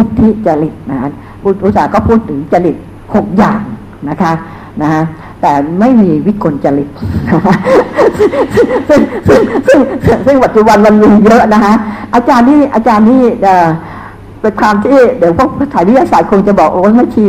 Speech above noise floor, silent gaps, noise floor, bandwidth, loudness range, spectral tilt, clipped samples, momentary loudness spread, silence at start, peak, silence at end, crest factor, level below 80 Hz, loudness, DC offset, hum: 20 dB; none; -27 dBFS; 14 kHz; 6 LU; -7.5 dB/octave; 2%; 11 LU; 0 s; 0 dBFS; 0 s; 8 dB; -32 dBFS; -8 LUFS; under 0.1%; none